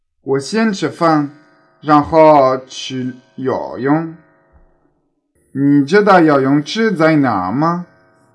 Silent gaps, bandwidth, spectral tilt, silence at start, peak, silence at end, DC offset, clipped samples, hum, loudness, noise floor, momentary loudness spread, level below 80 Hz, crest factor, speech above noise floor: none; 11 kHz; -6.5 dB/octave; 0.25 s; 0 dBFS; 0.5 s; under 0.1%; 0.2%; none; -14 LUFS; -63 dBFS; 15 LU; -52 dBFS; 14 dB; 50 dB